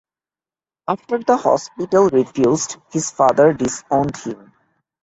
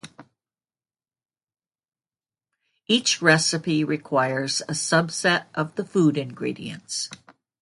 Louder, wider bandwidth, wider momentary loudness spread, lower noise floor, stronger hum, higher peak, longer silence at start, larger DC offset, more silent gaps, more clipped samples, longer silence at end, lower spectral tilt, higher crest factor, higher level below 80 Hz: first, -18 LUFS vs -23 LUFS; second, 8.2 kHz vs 11.5 kHz; about the same, 12 LU vs 12 LU; about the same, under -90 dBFS vs under -90 dBFS; neither; about the same, -2 dBFS vs -2 dBFS; first, 0.9 s vs 0.05 s; neither; neither; neither; first, 0.7 s vs 0.45 s; first, -5 dB/octave vs -3.5 dB/octave; second, 18 dB vs 24 dB; first, -54 dBFS vs -68 dBFS